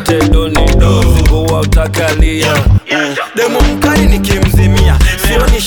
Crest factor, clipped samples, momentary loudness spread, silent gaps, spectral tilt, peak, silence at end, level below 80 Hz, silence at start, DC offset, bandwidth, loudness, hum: 8 dB; under 0.1%; 3 LU; none; -5.5 dB/octave; 0 dBFS; 0 s; -12 dBFS; 0 s; under 0.1%; 19.5 kHz; -10 LUFS; none